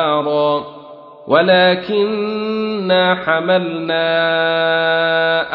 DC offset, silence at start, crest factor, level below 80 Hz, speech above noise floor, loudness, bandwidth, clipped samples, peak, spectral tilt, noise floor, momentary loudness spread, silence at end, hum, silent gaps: under 0.1%; 0 s; 14 dB; -60 dBFS; 22 dB; -15 LUFS; 5.6 kHz; under 0.1%; 0 dBFS; -8 dB/octave; -37 dBFS; 8 LU; 0 s; none; none